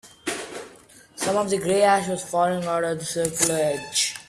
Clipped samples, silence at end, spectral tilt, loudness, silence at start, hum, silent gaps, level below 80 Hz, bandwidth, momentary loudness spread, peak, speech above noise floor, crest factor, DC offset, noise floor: under 0.1%; 0.05 s; -3 dB/octave; -23 LUFS; 0.05 s; none; none; -60 dBFS; 15 kHz; 12 LU; -4 dBFS; 27 dB; 20 dB; under 0.1%; -50 dBFS